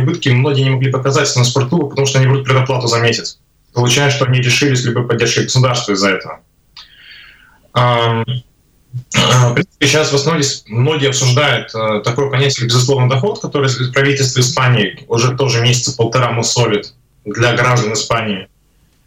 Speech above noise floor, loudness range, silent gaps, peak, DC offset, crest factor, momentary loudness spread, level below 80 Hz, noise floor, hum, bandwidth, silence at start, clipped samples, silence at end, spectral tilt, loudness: 40 dB; 3 LU; none; -2 dBFS; under 0.1%; 10 dB; 6 LU; -48 dBFS; -54 dBFS; none; 14 kHz; 0 s; under 0.1%; 0.6 s; -4.5 dB/octave; -13 LUFS